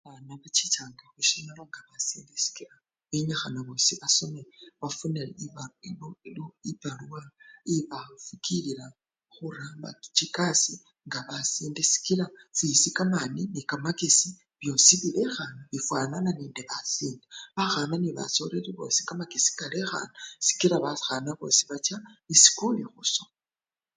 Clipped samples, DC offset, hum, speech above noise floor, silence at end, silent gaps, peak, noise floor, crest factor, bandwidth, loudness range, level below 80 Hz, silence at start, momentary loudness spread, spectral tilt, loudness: under 0.1%; under 0.1%; none; over 61 dB; 0.75 s; none; -2 dBFS; under -90 dBFS; 26 dB; 10.5 kHz; 12 LU; -72 dBFS; 0.05 s; 20 LU; -2 dB/octave; -25 LUFS